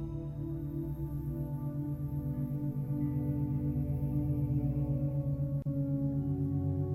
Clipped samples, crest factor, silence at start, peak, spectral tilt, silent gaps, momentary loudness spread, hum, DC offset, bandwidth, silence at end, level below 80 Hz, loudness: under 0.1%; 12 dB; 0 s; -22 dBFS; -11.5 dB/octave; none; 5 LU; none; under 0.1%; 13.5 kHz; 0 s; -46 dBFS; -35 LUFS